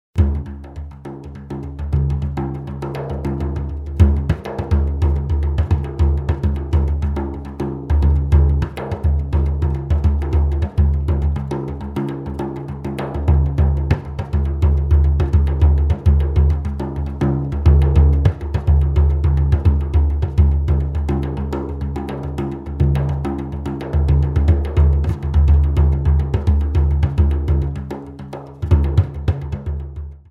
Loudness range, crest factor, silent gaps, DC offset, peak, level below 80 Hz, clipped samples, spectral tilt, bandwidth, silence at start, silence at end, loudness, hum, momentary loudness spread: 5 LU; 16 dB; none; under 0.1%; 0 dBFS; -18 dBFS; under 0.1%; -9.5 dB/octave; 4.3 kHz; 0.15 s; 0.1 s; -19 LUFS; none; 11 LU